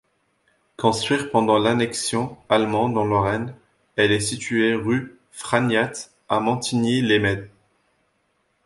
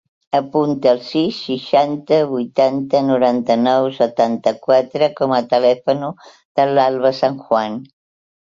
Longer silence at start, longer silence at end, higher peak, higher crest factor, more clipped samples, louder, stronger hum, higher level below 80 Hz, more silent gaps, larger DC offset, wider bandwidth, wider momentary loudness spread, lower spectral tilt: first, 0.8 s vs 0.35 s; first, 1.2 s vs 0.65 s; about the same, -2 dBFS vs -2 dBFS; about the same, 20 dB vs 16 dB; neither; second, -21 LUFS vs -17 LUFS; neither; first, -52 dBFS vs -62 dBFS; second, none vs 6.45-6.55 s; neither; first, 11.5 kHz vs 7.6 kHz; first, 9 LU vs 6 LU; second, -4.5 dB/octave vs -6.5 dB/octave